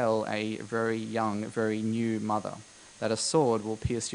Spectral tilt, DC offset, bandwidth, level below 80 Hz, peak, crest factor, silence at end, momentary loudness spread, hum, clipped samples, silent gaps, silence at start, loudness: -5 dB/octave; under 0.1%; 10.5 kHz; -54 dBFS; -12 dBFS; 18 dB; 0 s; 8 LU; none; under 0.1%; none; 0 s; -30 LUFS